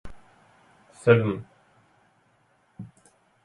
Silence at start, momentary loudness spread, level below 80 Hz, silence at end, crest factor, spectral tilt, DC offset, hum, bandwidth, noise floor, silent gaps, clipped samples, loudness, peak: 0.05 s; 25 LU; -58 dBFS; 0.6 s; 24 dB; -7.5 dB/octave; under 0.1%; none; 11 kHz; -65 dBFS; none; under 0.1%; -23 LUFS; -4 dBFS